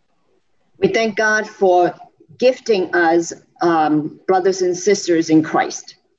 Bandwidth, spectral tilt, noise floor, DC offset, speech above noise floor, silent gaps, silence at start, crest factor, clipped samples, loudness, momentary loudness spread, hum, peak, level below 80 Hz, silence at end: 8 kHz; -4.5 dB/octave; -65 dBFS; under 0.1%; 49 dB; none; 0.8 s; 14 dB; under 0.1%; -17 LUFS; 6 LU; none; -2 dBFS; -64 dBFS; 0.3 s